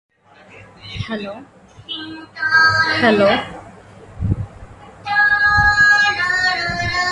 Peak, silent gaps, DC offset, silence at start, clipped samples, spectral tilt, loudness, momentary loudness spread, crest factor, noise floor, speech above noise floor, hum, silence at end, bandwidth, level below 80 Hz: 0 dBFS; none; under 0.1%; 0.55 s; under 0.1%; -4 dB/octave; -15 LUFS; 21 LU; 18 dB; -45 dBFS; 28 dB; none; 0 s; 11 kHz; -38 dBFS